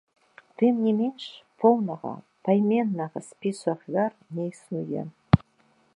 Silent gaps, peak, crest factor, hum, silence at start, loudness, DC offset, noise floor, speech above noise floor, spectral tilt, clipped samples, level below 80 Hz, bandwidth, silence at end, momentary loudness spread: none; -2 dBFS; 24 dB; none; 0.6 s; -26 LUFS; under 0.1%; -64 dBFS; 39 dB; -8 dB/octave; under 0.1%; -50 dBFS; 11 kHz; 0.6 s; 12 LU